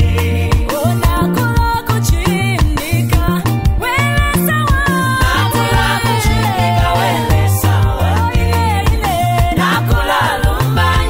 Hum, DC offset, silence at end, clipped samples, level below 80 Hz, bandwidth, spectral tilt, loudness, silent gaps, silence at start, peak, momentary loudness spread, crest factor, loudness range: none; under 0.1%; 0 s; under 0.1%; -20 dBFS; 16.5 kHz; -5.5 dB/octave; -14 LUFS; none; 0 s; -2 dBFS; 2 LU; 12 dB; 1 LU